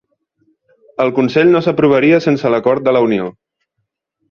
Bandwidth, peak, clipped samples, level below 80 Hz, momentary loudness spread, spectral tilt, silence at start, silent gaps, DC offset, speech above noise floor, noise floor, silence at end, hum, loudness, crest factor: 6.8 kHz; -2 dBFS; under 0.1%; -56 dBFS; 8 LU; -7.5 dB/octave; 1 s; none; under 0.1%; 61 dB; -73 dBFS; 1 s; none; -13 LUFS; 14 dB